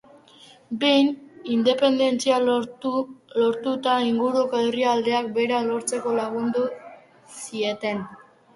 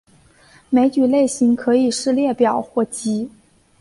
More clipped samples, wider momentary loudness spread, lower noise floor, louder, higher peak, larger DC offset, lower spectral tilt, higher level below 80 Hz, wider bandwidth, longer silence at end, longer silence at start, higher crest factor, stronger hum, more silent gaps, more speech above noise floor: neither; first, 11 LU vs 7 LU; about the same, -51 dBFS vs -51 dBFS; second, -23 LUFS vs -18 LUFS; about the same, -6 dBFS vs -4 dBFS; neither; about the same, -4 dB/octave vs -4.5 dB/octave; second, -68 dBFS vs -58 dBFS; about the same, 11.5 kHz vs 11.5 kHz; second, 0.4 s vs 0.55 s; about the same, 0.7 s vs 0.7 s; about the same, 16 dB vs 14 dB; neither; neither; second, 29 dB vs 34 dB